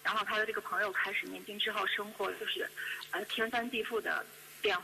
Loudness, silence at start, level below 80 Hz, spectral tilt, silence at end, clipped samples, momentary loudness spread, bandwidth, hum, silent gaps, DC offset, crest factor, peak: -35 LUFS; 0 s; -74 dBFS; -2 dB/octave; 0 s; under 0.1%; 6 LU; 14.5 kHz; none; none; under 0.1%; 16 dB; -20 dBFS